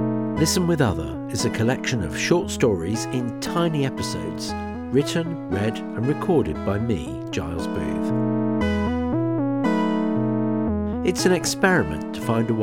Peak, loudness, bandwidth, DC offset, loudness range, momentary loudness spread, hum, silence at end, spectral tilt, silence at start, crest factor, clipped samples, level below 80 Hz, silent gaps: -4 dBFS; -23 LUFS; 18 kHz; 0.3%; 3 LU; 7 LU; none; 0 s; -5.5 dB/octave; 0 s; 18 dB; under 0.1%; -42 dBFS; none